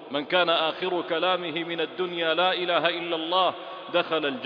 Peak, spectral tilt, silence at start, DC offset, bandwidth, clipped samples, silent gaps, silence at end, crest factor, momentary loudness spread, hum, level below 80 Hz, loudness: -6 dBFS; -6.5 dB/octave; 0 s; under 0.1%; 5.2 kHz; under 0.1%; none; 0 s; 20 dB; 6 LU; none; -76 dBFS; -25 LUFS